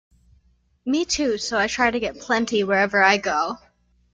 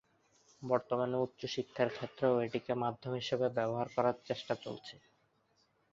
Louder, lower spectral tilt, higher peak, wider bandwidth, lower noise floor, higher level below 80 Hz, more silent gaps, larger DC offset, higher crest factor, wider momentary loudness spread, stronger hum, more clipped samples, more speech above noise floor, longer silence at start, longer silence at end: first, -21 LUFS vs -36 LUFS; second, -3 dB/octave vs -4.5 dB/octave; first, -4 dBFS vs -16 dBFS; first, 9.6 kHz vs 7.6 kHz; second, -61 dBFS vs -74 dBFS; first, -52 dBFS vs -74 dBFS; neither; neither; about the same, 20 dB vs 22 dB; first, 10 LU vs 7 LU; first, 60 Hz at -45 dBFS vs none; neither; about the same, 40 dB vs 39 dB; first, 0.85 s vs 0.6 s; second, 0.55 s vs 0.95 s